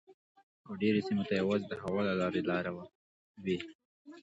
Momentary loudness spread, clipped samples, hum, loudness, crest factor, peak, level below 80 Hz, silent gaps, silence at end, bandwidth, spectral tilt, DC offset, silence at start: 15 LU; under 0.1%; none; -34 LUFS; 18 dB; -18 dBFS; -66 dBFS; 0.14-0.35 s, 0.43-0.64 s, 2.95-3.35 s, 3.75-3.79 s, 3.85-4.05 s; 0 s; 8 kHz; -7 dB/octave; under 0.1%; 0.1 s